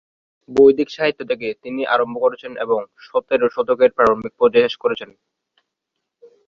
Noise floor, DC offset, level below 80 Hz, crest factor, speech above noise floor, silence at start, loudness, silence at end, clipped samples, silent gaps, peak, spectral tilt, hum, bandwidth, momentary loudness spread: -79 dBFS; under 0.1%; -58 dBFS; 18 dB; 61 dB; 0.5 s; -18 LUFS; 1.45 s; under 0.1%; none; -2 dBFS; -6 dB/octave; none; 7 kHz; 11 LU